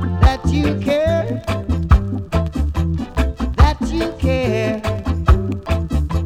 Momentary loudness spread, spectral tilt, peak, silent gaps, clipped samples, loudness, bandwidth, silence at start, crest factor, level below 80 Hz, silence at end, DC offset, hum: 6 LU; -7.5 dB/octave; -2 dBFS; none; under 0.1%; -19 LUFS; 12 kHz; 0 s; 14 dB; -20 dBFS; 0 s; under 0.1%; none